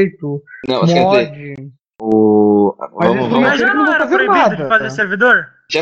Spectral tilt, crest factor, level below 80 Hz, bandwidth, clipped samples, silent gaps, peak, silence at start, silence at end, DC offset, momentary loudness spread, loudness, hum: -6 dB/octave; 14 dB; -58 dBFS; 8 kHz; under 0.1%; none; 0 dBFS; 0 s; 0 s; under 0.1%; 14 LU; -13 LUFS; none